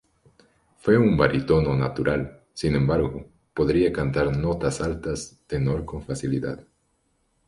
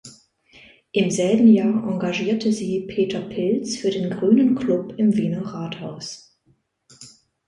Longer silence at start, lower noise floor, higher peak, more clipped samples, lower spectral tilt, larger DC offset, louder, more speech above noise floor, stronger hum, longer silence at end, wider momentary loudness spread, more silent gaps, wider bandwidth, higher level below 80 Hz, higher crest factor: first, 0.85 s vs 0.05 s; first, -69 dBFS vs -64 dBFS; about the same, -6 dBFS vs -4 dBFS; neither; about the same, -7 dB/octave vs -6 dB/octave; neither; second, -24 LUFS vs -21 LUFS; about the same, 46 dB vs 44 dB; neither; first, 0.85 s vs 0.4 s; about the same, 13 LU vs 15 LU; neither; about the same, 11.5 kHz vs 11 kHz; first, -40 dBFS vs -60 dBFS; about the same, 20 dB vs 18 dB